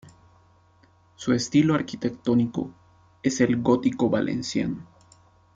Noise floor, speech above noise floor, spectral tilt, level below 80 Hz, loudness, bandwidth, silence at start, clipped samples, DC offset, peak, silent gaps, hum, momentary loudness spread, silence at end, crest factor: -59 dBFS; 35 dB; -6 dB/octave; -60 dBFS; -24 LUFS; 7.8 kHz; 1.2 s; under 0.1%; under 0.1%; -8 dBFS; none; none; 11 LU; 0.7 s; 18 dB